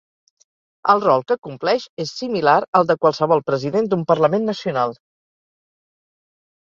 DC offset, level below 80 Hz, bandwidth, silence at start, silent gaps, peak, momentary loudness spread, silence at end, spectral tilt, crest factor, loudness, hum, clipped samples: under 0.1%; -64 dBFS; 7.6 kHz; 0.85 s; 1.38-1.42 s, 1.89-1.97 s, 2.68-2.73 s; -2 dBFS; 8 LU; 1.75 s; -6 dB/octave; 18 dB; -19 LUFS; none; under 0.1%